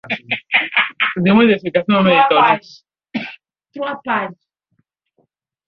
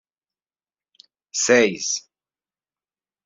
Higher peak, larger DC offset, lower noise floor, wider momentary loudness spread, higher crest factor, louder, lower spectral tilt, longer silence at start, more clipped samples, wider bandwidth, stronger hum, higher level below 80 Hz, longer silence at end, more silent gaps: about the same, -2 dBFS vs -2 dBFS; neither; second, -67 dBFS vs under -90 dBFS; first, 15 LU vs 12 LU; second, 16 dB vs 22 dB; first, -15 LUFS vs -20 LUFS; first, -7.5 dB/octave vs -2 dB/octave; second, 0.05 s vs 1.35 s; neither; second, 6.2 kHz vs 7.8 kHz; neither; first, -58 dBFS vs -70 dBFS; about the same, 1.35 s vs 1.25 s; neither